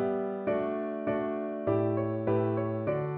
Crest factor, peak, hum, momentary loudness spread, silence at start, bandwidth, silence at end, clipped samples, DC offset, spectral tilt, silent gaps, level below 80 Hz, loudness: 14 dB; -16 dBFS; none; 4 LU; 0 s; 4.2 kHz; 0 s; under 0.1%; under 0.1%; -8.5 dB/octave; none; -64 dBFS; -31 LUFS